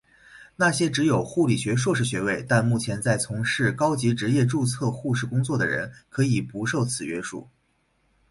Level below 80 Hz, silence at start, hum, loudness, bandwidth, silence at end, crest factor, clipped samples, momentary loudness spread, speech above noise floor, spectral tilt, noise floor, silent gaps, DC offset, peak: -56 dBFS; 0.35 s; none; -24 LUFS; 11.5 kHz; 0.85 s; 16 dB; under 0.1%; 6 LU; 44 dB; -5.5 dB/octave; -68 dBFS; none; under 0.1%; -8 dBFS